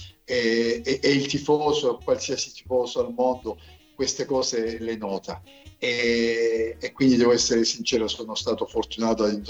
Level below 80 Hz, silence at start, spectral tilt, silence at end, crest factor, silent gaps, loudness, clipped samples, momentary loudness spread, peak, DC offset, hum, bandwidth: -52 dBFS; 0 s; -3.5 dB/octave; 0 s; 16 dB; none; -24 LUFS; under 0.1%; 10 LU; -8 dBFS; under 0.1%; none; 8.4 kHz